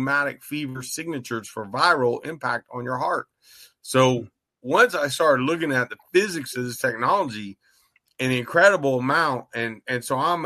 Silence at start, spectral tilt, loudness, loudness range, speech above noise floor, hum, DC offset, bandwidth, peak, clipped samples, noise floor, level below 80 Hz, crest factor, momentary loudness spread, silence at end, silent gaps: 0 s; -4.5 dB/octave; -23 LUFS; 3 LU; 41 dB; none; under 0.1%; 13.5 kHz; -4 dBFS; under 0.1%; -64 dBFS; -66 dBFS; 20 dB; 12 LU; 0 s; none